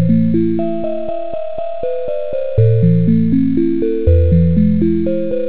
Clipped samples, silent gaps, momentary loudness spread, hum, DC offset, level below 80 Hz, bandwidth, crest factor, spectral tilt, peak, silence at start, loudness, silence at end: under 0.1%; none; 10 LU; none; 8%; -24 dBFS; 4 kHz; 14 dB; -13.5 dB/octave; 0 dBFS; 0 s; -15 LUFS; 0 s